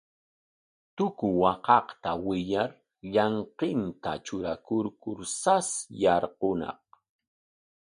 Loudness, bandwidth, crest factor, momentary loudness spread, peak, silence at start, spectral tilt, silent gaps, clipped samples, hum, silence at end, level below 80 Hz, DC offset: -28 LUFS; 11.5 kHz; 22 dB; 11 LU; -6 dBFS; 0.95 s; -4.5 dB/octave; none; under 0.1%; none; 1.2 s; -60 dBFS; under 0.1%